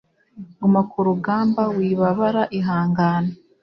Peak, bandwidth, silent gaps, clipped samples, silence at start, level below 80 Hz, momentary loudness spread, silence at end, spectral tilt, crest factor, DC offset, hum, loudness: -6 dBFS; 6 kHz; none; under 0.1%; 0.35 s; -58 dBFS; 3 LU; 0.25 s; -10 dB/octave; 14 dB; under 0.1%; none; -20 LUFS